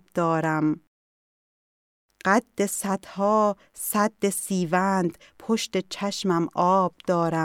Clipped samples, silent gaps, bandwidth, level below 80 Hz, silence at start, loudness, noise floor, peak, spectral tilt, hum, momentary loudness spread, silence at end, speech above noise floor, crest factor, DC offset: under 0.1%; 0.87-2.09 s; 17 kHz; -68 dBFS; 0.15 s; -25 LUFS; under -90 dBFS; -6 dBFS; -5 dB/octave; none; 8 LU; 0 s; over 66 dB; 20 dB; under 0.1%